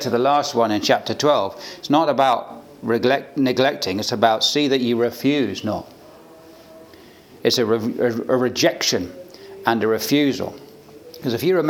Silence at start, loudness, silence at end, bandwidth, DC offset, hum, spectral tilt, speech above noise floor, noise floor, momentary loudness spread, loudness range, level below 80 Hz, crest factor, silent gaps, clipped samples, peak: 0 s; -20 LUFS; 0 s; 19.5 kHz; under 0.1%; none; -4 dB/octave; 26 dB; -45 dBFS; 11 LU; 4 LU; -66 dBFS; 20 dB; none; under 0.1%; 0 dBFS